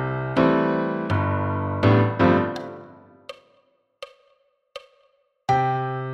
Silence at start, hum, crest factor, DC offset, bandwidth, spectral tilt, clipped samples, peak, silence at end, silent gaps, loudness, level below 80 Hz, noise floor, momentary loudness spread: 0 s; none; 20 dB; under 0.1%; 8 kHz; -8.5 dB/octave; under 0.1%; -4 dBFS; 0 s; none; -22 LUFS; -54 dBFS; -64 dBFS; 24 LU